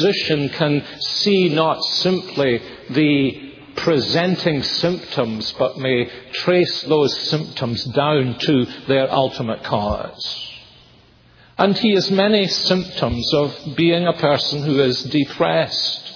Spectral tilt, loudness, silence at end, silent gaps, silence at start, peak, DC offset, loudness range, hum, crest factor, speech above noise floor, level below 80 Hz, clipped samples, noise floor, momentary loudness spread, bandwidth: -5.5 dB/octave; -18 LUFS; 0 s; none; 0 s; 0 dBFS; under 0.1%; 3 LU; none; 18 dB; 32 dB; -48 dBFS; under 0.1%; -50 dBFS; 8 LU; 5.4 kHz